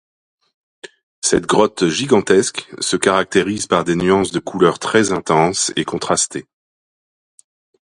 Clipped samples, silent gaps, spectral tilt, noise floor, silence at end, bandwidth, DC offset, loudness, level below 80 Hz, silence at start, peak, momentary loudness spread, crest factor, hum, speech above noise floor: under 0.1%; 1.03-1.22 s; -3.5 dB/octave; under -90 dBFS; 1.45 s; 11.5 kHz; under 0.1%; -16 LUFS; -50 dBFS; 0.85 s; 0 dBFS; 7 LU; 18 dB; none; over 74 dB